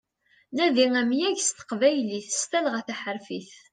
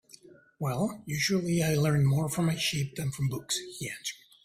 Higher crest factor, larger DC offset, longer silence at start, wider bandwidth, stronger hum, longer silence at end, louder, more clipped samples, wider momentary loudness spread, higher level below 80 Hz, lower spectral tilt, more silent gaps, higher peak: about the same, 18 dB vs 14 dB; neither; first, 0.5 s vs 0.3 s; second, 10.5 kHz vs 16 kHz; neither; about the same, 0.2 s vs 0.3 s; first, -25 LUFS vs -29 LUFS; neither; first, 13 LU vs 10 LU; second, -76 dBFS vs -60 dBFS; second, -2.5 dB/octave vs -5 dB/octave; neither; first, -8 dBFS vs -16 dBFS